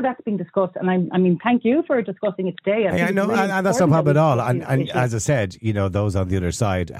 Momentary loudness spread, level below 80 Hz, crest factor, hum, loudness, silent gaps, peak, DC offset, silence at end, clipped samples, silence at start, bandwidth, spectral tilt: 7 LU; -48 dBFS; 14 dB; none; -20 LUFS; none; -6 dBFS; under 0.1%; 0 s; under 0.1%; 0 s; 14.5 kHz; -6.5 dB/octave